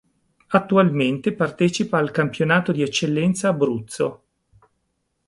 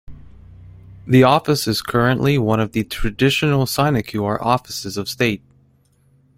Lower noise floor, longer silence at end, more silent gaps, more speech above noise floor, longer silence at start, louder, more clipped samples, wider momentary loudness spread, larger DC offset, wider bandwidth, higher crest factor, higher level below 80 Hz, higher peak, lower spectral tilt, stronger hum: first, -73 dBFS vs -57 dBFS; about the same, 1.1 s vs 1 s; neither; first, 53 dB vs 39 dB; first, 0.5 s vs 0.1 s; second, -21 LUFS vs -18 LUFS; neither; second, 6 LU vs 11 LU; neither; second, 11.5 kHz vs 16.5 kHz; about the same, 18 dB vs 18 dB; second, -60 dBFS vs -38 dBFS; about the same, -2 dBFS vs -2 dBFS; about the same, -5.5 dB/octave vs -5.5 dB/octave; neither